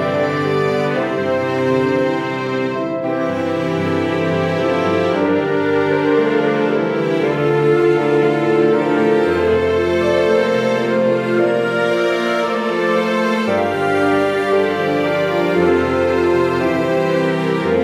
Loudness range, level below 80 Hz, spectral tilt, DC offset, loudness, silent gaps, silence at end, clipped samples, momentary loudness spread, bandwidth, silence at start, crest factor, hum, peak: 3 LU; -50 dBFS; -6.5 dB/octave; under 0.1%; -16 LUFS; none; 0 s; under 0.1%; 4 LU; 13.5 kHz; 0 s; 12 dB; none; -4 dBFS